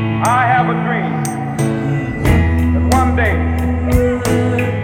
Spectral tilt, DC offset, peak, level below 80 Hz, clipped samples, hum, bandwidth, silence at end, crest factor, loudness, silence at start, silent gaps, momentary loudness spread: -6.5 dB/octave; under 0.1%; 0 dBFS; -24 dBFS; under 0.1%; none; 16 kHz; 0 s; 14 dB; -15 LUFS; 0 s; none; 5 LU